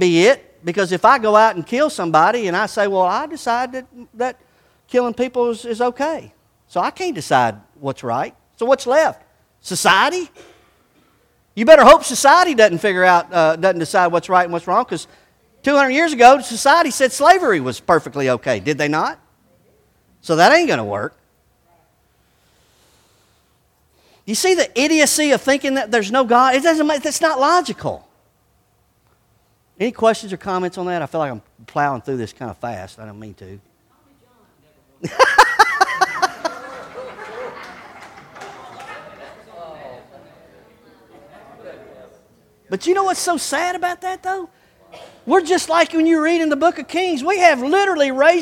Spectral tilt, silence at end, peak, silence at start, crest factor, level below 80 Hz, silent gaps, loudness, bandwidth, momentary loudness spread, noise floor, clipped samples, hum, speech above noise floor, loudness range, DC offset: -3.5 dB/octave; 0 s; 0 dBFS; 0 s; 18 dB; -54 dBFS; none; -16 LUFS; 17 kHz; 21 LU; -60 dBFS; under 0.1%; none; 44 dB; 12 LU; under 0.1%